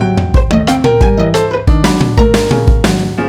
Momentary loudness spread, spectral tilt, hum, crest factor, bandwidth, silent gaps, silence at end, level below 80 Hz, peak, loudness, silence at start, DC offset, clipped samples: 2 LU; -6.5 dB/octave; none; 10 dB; 14 kHz; none; 0 s; -14 dBFS; 0 dBFS; -11 LUFS; 0 s; under 0.1%; under 0.1%